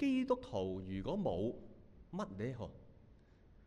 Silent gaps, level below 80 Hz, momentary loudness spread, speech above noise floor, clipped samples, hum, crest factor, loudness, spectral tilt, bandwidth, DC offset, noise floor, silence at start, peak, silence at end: none; -60 dBFS; 15 LU; 25 dB; under 0.1%; none; 18 dB; -41 LUFS; -7.5 dB/octave; 9.2 kHz; under 0.1%; -63 dBFS; 0 s; -22 dBFS; 0 s